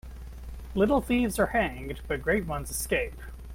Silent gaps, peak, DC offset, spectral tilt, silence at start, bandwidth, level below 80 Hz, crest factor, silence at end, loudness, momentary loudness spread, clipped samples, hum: none; -12 dBFS; under 0.1%; -5 dB/octave; 0.05 s; 16.5 kHz; -40 dBFS; 16 dB; 0 s; -28 LUFS; 18 LU; under 0.1%; none